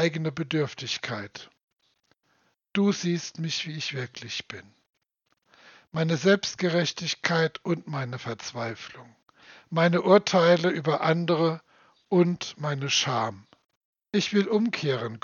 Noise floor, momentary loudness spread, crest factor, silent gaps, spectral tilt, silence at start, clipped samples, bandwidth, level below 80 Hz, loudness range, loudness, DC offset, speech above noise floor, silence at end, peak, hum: -75 dBFS; 13 LU; 24 dB; 1.63-1.68 s, 13.77-13.93 s; -5 dB/octave; 0 s; under 0.1%; 7.2 kHz; -74 dBFS; 7 LU; -26 LUFS; under 0.1%; 49 dB; 0.05 s; -4 dBFS; none